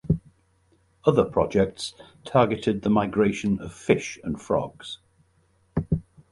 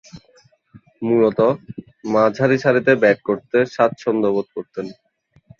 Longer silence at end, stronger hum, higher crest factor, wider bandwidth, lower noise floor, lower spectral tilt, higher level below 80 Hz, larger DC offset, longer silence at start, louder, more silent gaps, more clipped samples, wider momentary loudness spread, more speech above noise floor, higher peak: second, 0.3 s vs 0.65 s; neither; about the same, 22 dB vs 18 dB; first, 11.5 kHz vs 7.2 kHz; first, -64 dBFS vs -55 dBFS; about the same, -6.5 dB/octave vs -7 dB/octave; first, -46 dBFS vs -60 dBFS; neither; about the same, 0.05 s vs 0.15 s; second, -25 LUFS vs -18 LUFS; neither; neither; about the same, 13 LU vs 15 LU; about the same, 40 dB vs 38 dB; about the same, -4 dBFS vs -2 dBFS